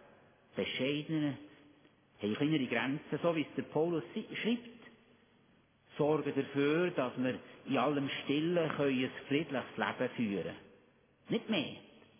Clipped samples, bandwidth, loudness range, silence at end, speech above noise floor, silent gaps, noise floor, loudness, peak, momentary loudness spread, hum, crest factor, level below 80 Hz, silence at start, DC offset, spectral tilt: under 0.1%; 3.6 kHz; 3 LU; 0.35 s; 34 dB; none; -68 dBFS; -35 LUFS; -18 dBFS; 9 LU; none; 18 dB; -76 dBFS; 0.55 s; under 0.1%; -4.5 dB/octave